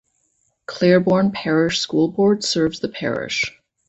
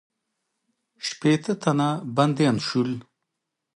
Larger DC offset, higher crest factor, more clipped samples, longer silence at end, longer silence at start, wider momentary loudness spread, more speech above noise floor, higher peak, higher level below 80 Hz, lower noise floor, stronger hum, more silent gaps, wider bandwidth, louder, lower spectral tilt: neither; about the same, 18 dB vs 20 dB; neither; second, 0.4 s vs 0.75 s; second, 0.7 s vs 1 s; about the same, 10 LU vs 11 LU; second, 48 dB vs 59 dB; first, -2 dBFS vs -6 dBFS; first, -56 dBFS vs -68 dBFS; second, -66 dBFS vs -82 dBFS; neither; neither; second, 8.2 kHz vs 11.5 kHz; first, -19 LUFS vs -24 LUFS; about the same, -5 dB/octave vs -6 dB/octave